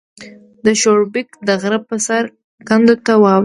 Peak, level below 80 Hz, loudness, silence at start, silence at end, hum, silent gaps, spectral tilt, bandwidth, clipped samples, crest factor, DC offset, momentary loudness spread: 0 dBFS; -58 dBFS; -14 LUFS; 0.2 s; 0 s; none; 2.44-2.58 s; -4.5 dB/octave; 11.5 kHz; under 0.1%; 14 dB; under 0.1%; 8 LU